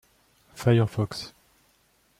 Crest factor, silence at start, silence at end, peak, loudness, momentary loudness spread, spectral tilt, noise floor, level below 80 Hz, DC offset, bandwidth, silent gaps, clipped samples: 20 dB; 0.55 s; 0.9 s; -8 dBFS; -26 LUFS; 16 LU; -7 dB/octave; -65 dBFS; -60 dBFS; under 0.1%; 14 kHz; none; under 0.1%